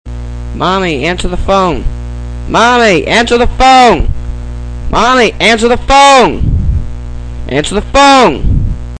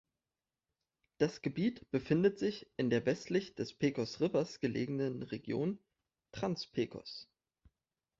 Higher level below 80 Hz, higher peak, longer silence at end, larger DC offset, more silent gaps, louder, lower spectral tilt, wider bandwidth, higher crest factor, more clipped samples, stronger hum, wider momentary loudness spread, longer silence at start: first, -18 dBFS vs -70 dBFS; first, 0 dBFS vs -16 dBFS; second, 0 s vs 0.95 s; neither; neither; first, -8 LUFS vs -36 LUFS; second, -4.5 dB/octave vs -6.5 dB/octave; first, 11 kHz vs 7.8 kHz; second, 8 dB vs 20 dB; first, 0.5% vs under 0.1%; first, 60 Hz at -25 dBFS vs none; first, 18 LU vs 10 LU; second, 0.05 s vs 1.2 s